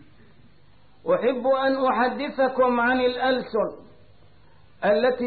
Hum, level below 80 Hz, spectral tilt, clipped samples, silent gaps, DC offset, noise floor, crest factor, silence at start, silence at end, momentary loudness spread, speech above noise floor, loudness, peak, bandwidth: none; -60 dBFS; -9.5 dB/octave; under 0.1%; none; 0.3%; -57 dBFS; 12 dB; 1.05 s; 0 s; 6 LU; 35 dB; -23 LUFS; -12 dBFS; 4.7 kHz